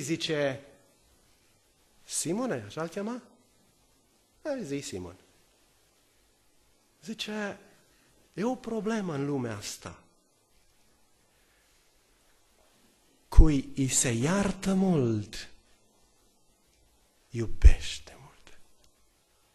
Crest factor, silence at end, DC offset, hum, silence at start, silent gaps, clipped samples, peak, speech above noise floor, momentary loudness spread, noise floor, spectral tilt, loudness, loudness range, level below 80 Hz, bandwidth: 28 dB; 0.95 s; under 0.1%; none; 0 s; none; under 0.1%; -2 dBFS; 39 dB; 19 LU; -66 dBFS; -5 dB/octave; -30 LUFS; 14 LU; -34 dBFS; 13 kHz